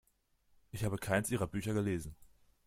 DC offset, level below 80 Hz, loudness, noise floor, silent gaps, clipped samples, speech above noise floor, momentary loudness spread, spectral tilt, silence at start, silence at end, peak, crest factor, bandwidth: under 0.1%; -58 dBFS; -36 LUFS; -74 dBFS; none; under 0.1%; 38 dB; 11 LU; -5.5 dB/octave; 0.75 s; 0.4 s; -18 dBFS; 20 dB; 16 kHz